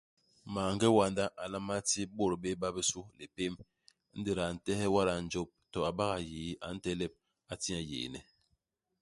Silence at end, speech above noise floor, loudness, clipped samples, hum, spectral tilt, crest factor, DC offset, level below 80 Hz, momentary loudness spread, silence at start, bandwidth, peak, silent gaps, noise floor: 0.8 s; 46 dB; -35 LUFS; under 0.1%; none; -4 dB/octave; 22 dB; under 0.1%; -58 dBFS; 12 LU; 0.45 s; 11.5 kHz; -14 dBFS; none; -80 dBFS